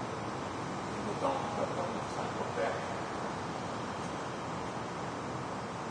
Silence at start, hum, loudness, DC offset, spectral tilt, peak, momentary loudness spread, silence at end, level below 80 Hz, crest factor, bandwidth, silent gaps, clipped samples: 0 s; none; -37 LUFS; under 0.1%; -5 dB/octave; -20 dBFS; 4 LU; 0 s; -62 dBFS; 16 dB; 10.5 kHz; none; under 0.1%